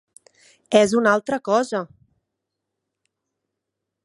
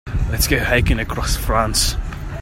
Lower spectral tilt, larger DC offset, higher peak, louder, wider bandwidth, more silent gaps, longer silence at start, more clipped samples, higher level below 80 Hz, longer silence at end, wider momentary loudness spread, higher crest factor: about the same, -4.5 dB/octave vs -3.5 dB/octave; neither; about the same, -2 dBFS vs -2 dBFS; about the same, -20 LUFS vs -18 LUFS; second, 11.5 kHz vs 16.5 kHz; neither; first, 0.7 s vs 0.05 s; neither; second, -66 dBFS vs -22 dBFS; first, 2.2 s vs 0 s; first, 11 LU vs 7 LU; first, 22 dB vs 16 dB